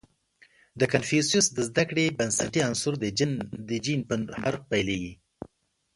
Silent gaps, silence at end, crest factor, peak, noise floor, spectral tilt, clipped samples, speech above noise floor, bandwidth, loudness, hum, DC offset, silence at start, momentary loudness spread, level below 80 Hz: none; 0.5 s; 22 dB; -6 dBFS; -62 dBFS; -4 dB/octave; under 0.1%; 35 dB; 11.5 kHz; -26 LUFS; none; under 0.1%; 0.75 s; 11 LU; -56 dBFS